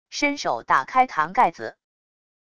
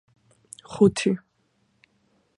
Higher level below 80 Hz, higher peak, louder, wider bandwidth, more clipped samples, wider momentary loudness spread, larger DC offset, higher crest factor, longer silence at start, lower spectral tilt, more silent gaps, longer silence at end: about the same, -60 dBFS vs -62 dBFS; about the same, -6 dBFS vs -6 dBFS; about the same, -22 LUFS vs -23 LUFS; about the same, 11 kHz vs 11.5 kHz; neither; second, 11 LU vs 26 LU; neither; about the same, 18 dB vs 22 dB; second, 0.1 s vs 0.7 s; second, -3 dB/octave vs -6 dB/octave; neither; second, 0.75 s vs 1.2 s